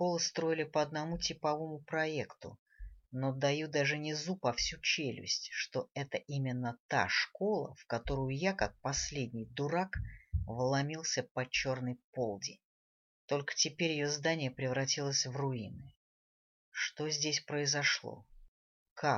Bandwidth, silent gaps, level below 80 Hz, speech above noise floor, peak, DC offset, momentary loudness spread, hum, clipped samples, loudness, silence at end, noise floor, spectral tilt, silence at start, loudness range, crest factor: 7.6 kHz; 2.59-2.66 s, 6.80-6.89 s, 11.31-11.35 s, 12.04-12.13 s, 12.64-13.28 s, 15.96-16.72 s, 18.48-18.96 s; -54 dBFS; over 54 dB; -16 dBFS; under 0.1%; 9 LU; none; under 0.1%; -35 LUFS; 0 s; under -90 dBFS; -3.5 dB/octave; 0 s; 2 LU; 20 dB